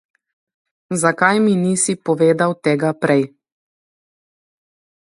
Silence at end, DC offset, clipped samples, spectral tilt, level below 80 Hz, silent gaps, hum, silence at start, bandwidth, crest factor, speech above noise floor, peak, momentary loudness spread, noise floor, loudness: 1.8 s; under 0.1%; under 0.1%; -5 dB/octave; -64 dBFS; none; none; 0.9 s; 11.5 kHz; 18 dB; over 74 dB; 0 dBFS; 4 LU; under -90 dBFS; -17 LUFS